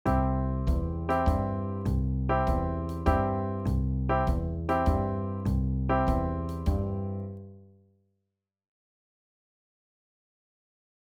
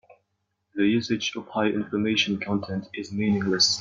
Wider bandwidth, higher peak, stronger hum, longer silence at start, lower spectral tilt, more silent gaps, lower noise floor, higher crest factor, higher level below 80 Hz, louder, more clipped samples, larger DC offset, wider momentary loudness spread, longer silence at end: first, 11.5 kHz vs 7.6 kHz; second, -12 dBFS vs -6 dBFS; neither; second, 0.05 s vs 0.75 s; first, -9 dB/octave vs -4 dB/octave; neither; first, -85 dBFS vs -77 dBFS; about the same, 18 dB vs 20 dB; first, -34 dBFS vs -64 dBFS; second, -29 LUFS vs -25 LUFS; neither; neither; second, 6 LU vs 11 LU; first, 3.55 s vs 0 s